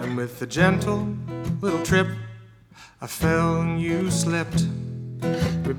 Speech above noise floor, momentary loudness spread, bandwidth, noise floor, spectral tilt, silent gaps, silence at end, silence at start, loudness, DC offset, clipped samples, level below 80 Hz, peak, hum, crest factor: 21 dB; 12 LU; 16.5 kHz; -45 dBFS; -5.5 dB/octave; none; 0 s; 0 s; -24 LUFS; under 0.1%; under 0.1%; -46 dBFS; -2 dBFS; none; 22 dB